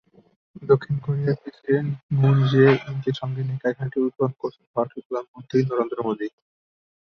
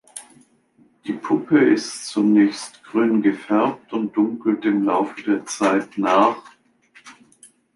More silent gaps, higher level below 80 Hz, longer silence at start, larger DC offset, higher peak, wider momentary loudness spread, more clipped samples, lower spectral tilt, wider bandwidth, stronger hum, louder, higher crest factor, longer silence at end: first, 2.03-2.09 s, 4.67-4.74 s, 5.05-5.10 s, 5.28-5.34 s vs none; first, -60 dBFS vs -70 dBFS; first, 0.55 s vs 0.15 s; neither; about the same, -4 dBFS vs -2 dBFS; about the same, 13 LU vs 13 LU; neither; first, -9 dB/octave vs -5 dB/octave; second, 6.4 kHz vs 11.5 kHz; neither; second, -23 LUFS vs -20 LUFS; about the same, 18 dB vs 18 dB; about the same, 0.75 s vs 0.65 s